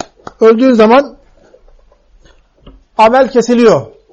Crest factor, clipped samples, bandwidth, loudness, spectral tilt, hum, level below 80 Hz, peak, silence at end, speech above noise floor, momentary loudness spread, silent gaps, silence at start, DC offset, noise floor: 12 dB; under 0.1%; 8.4 kHz; -8 LUFS; -5.5 dB/octave; none; -44 dBFS; 0 dBFS; 0.25 s; 38 dB; 14 LU; none; 0.4 s; under 0.1%; -45 dBFS